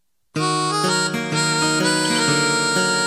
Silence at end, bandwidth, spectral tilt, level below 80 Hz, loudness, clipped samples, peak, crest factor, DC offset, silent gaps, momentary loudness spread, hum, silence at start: 0 s; 14 kHz; -3 dB/octave; -66 dBFS; -18 LUFS; under 0.1%; -6 dBFS; 14 dB; under 0.1%; none; 4 LU; none; 0.35 s